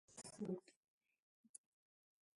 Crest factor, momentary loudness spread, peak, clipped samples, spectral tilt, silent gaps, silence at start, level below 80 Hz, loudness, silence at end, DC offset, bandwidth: 22 dB; 15 LU; -34 dBFS; under 0.1%; -5.5 dB/octave; 0.76-1.01 s, 1.19-1.54 s; 0.1 s; under -90 dBFS; -51 LUFS; 0.8 s; under 0.1%; 11.5 kHz